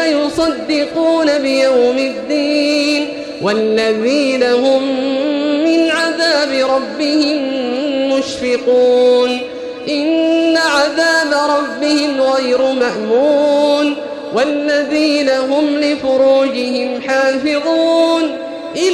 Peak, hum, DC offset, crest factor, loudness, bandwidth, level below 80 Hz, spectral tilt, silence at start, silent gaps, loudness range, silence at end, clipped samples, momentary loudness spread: -2 dBFS; none; under 0.1%; 12 dB; -14 LUFS; 12.5 kHz; -54 dBFS; -3.5 dB/octave; 0 s; none; 1 LU; 0 s; under 0.1%; 6 LU